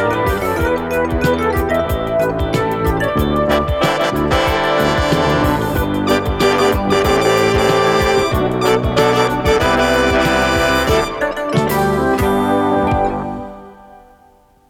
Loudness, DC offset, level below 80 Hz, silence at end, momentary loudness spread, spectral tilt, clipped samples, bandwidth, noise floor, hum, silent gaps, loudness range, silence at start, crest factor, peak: -15 LUFS; under 0.1%; -28 dBFS; 0.75 s; 4 LU; -5.5 dB/octave; under 0.1%; 18 kHz; -50 dBFS; none; none; 3 LU; 0 s; 14 dB; 0 dBFS